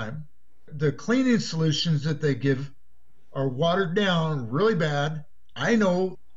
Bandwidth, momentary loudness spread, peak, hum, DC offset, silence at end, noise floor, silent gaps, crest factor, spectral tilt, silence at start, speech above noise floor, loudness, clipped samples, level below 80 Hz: 7.8 kHz; 15 LU; -10 dBFS; none; 1%; 0.2 s; -66 dBFS; none; 14 dB; -6 dB/octave; 0 s; 42 dB; -25 LUFS; under 0.1%; -58 dBFS